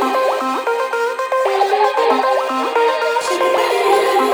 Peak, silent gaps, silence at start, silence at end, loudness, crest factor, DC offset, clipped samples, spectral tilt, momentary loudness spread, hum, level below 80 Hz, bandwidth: -2 dBFS; none; 0 s; 0 s; -16 LUFS; 14 dB; under 0.1%; under 0.1%; -1.5 dB/octave; 5 LU; none; -70 dBFS; over 20 kHz